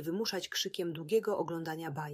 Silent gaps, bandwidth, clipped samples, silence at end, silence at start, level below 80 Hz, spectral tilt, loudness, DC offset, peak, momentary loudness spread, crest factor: none; 16 kHz; under 0.1%; 0 s; 0 s; -80 dBFS; -4 dB/octave; -35 LUFS; under 0.1%; -18 dBFS; 7 LU; 16 dB